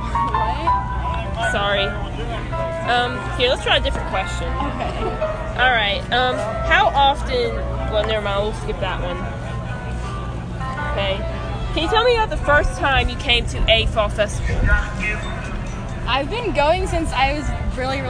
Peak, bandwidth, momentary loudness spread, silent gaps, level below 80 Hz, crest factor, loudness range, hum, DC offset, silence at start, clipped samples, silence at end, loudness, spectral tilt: 0 dBFS; 10.5 kHz; 11 LU; none; -26 dBFS; 20 dB; 6 LU; none; under 0.1%; 0 s; under 0.1%; 0 s; -20 LUFS; -5 dB/octave